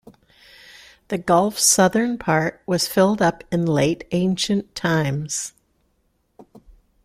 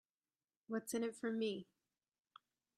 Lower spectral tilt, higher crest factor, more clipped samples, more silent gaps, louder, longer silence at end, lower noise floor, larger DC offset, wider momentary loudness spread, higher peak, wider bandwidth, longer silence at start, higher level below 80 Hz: about the same, -4 dB/octave vs -4 dB/octave; about the same, 18 dB vs 16 dB; neither; neither; first, -20 LUFS vs -43 LUFS; second, 0.6 s vs 1.15 s; second, -67 dBFS vs under -90 dBFS; neither; about the same, 10 LU vs 9 LU; first, -4 dBFS vs -30 dBFS; first, 16 kHz vs 13 kHz; first, 1.1 s vs 0.7 s; first, -54 dBFS vs -90 dBFS